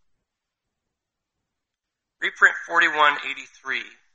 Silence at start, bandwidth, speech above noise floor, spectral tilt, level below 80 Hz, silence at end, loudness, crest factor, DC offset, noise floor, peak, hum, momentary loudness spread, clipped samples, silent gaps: 2.2 s; 8.2 kHz; 62 dB; -1 dB/octave; -78 dBFS; 0.25 s; -20 LUFS; 24 dB; under 0.1%; -84 dBFS; -2 dBFS; none; 12 LU; under 0.1%; none